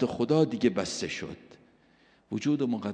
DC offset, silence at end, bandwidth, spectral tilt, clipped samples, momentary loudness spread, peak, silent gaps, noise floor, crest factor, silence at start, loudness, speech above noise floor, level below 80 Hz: under 0.1%; 0 s; 10 kHz; -5.5 dB/octave; under 0.1%; 13 LU; -12 dBFS; none; -63 dBFS; 18 dB; 0 s; -29 LUFS; 35 dB; -64 dBFS